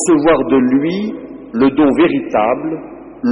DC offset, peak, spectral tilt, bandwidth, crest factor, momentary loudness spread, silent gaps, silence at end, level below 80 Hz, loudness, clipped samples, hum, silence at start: under 0.1%; -4 dBFS; -5.5 dB/octave; 11 kHz; 10 dB; 13 LU; none; 0 s; -44 dBFS; -14 LUFS; under 0.1%; none; 0 s